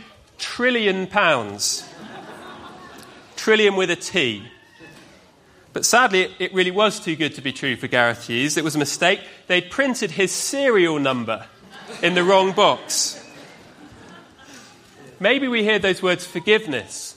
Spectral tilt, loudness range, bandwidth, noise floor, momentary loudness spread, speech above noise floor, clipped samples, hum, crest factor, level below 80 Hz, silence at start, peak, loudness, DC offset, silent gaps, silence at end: -3 dB/octave; 3 LU; 15.5 kHz; -52 dBFS; 17 LU; 32 dB; under 0.1%; none; 22 dB; -62 dBFS; 0 s; 0 dBFS; -19 LUFS; under 0.1%; none; 0.05 s